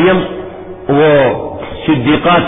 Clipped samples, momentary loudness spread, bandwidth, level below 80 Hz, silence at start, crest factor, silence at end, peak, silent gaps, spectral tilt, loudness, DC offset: under 0.1%; 16 LU; 3.9 kHz; -38 dBFS; 0 s; 12 dB; 0 s; 0 dBFS; none; -10.5 dB/octave; -12 LUFS; under 0.1%